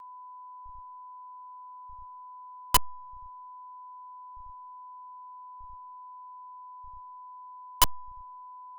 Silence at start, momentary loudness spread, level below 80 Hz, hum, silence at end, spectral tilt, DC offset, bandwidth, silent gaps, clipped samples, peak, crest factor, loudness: 0 s; 21 LU; -50 dBFS; none; 0 s; 2.5 dB/octave; under 0.1%; 1.4 kHz; none; under 0.1%; -8 dBFS; 28 dB; -26 LUFS